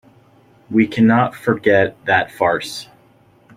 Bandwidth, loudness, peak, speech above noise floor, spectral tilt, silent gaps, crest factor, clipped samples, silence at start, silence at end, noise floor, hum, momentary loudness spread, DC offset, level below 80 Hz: 15 kHz; -16 LUFS; -2 dBFS; 36 dB; -6 dB/octave; none; 16 dB; under 0.1%; 0.7 s; 0.75 s; -52 dBFS; none; 8 LU; under 0.1%; -56 dBFS